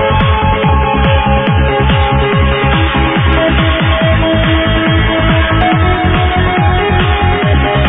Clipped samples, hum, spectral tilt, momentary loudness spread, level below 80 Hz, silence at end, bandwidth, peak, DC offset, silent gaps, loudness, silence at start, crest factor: under 0.1%; none; -10 dB/octave; 1 LU; -16 dBFS; 0 s; 3.9 kHz; 0 dBFS; 0.3%; none; -11 LUFS; 0 s; 10 dB